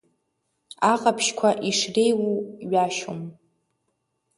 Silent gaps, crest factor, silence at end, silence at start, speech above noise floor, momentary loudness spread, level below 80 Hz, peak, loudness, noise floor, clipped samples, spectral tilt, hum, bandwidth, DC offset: none; 20 dB; 1.05 s; 0.8 s; 52 dB; 11 LU; -70 dBFS; -4 dBFS; -23 LUFS; -75 dBFS; under 0.1%; -3.5 dB/octave; none; 11.5 kHz; under 0.1%